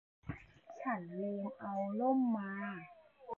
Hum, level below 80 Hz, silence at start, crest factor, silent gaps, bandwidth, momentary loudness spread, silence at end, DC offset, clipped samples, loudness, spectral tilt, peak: none; -68 dBFS; 0.25 s; 18 dB; none; 6.8 kHz; 19 LU; 0.05 s; under 0.1%; under 0.1%; -38 LUFS; -7.5 dB/octave; -22 dBFS